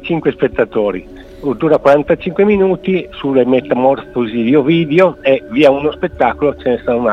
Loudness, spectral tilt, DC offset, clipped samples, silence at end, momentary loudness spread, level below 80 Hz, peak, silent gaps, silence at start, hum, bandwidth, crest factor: -13 LUFS; -8 dB/octave; under 0.1%; under 0.1%; 0 s; 7 LU; -40 dBFS; 0 dBFS; none; 0 s; none; 7.6 kHz; 12 dB